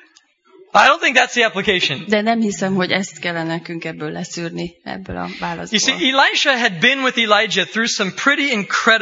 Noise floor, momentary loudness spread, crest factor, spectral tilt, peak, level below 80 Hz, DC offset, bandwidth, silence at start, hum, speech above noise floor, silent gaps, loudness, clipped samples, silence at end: -53 dBFS; 13 LU; 18 dB; -3 dB/octave; 0 dBFS; -54 dBFS; under 0.1%; 9 kHz; 0.75 s; none; 36 dB; none; -16 LUFS; under 0.1%; 0 s